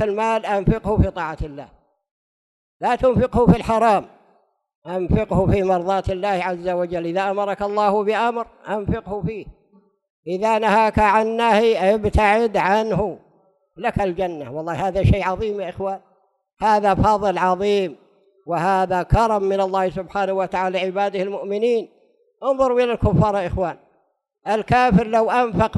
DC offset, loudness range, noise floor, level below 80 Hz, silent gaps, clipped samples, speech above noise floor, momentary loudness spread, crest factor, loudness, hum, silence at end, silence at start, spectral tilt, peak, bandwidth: under 0.1%; 4 LU; -66 dBFS; -36 dBFS; 2.11-2.80 s, 4.75-4.82 s, 10.10-10.23 s; under 0.1%; 47 dB; 11 LU; 16 dB; -20 LUFS; none; 0 s; 0 s; -7 dB/octave; -4 dBFS; 12 kHz